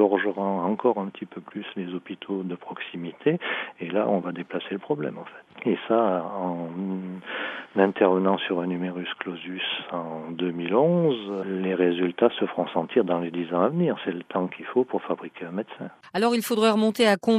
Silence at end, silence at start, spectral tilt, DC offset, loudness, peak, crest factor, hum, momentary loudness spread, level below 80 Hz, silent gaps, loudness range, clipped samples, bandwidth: 0 s; 0 s; -6 dB/octave; under 0.1%; -26 LUFS; -4 dBFS; 22 dB; none; 13 LU; -78 dBFS; none; 5 LU; under 0.1%; 13 kHz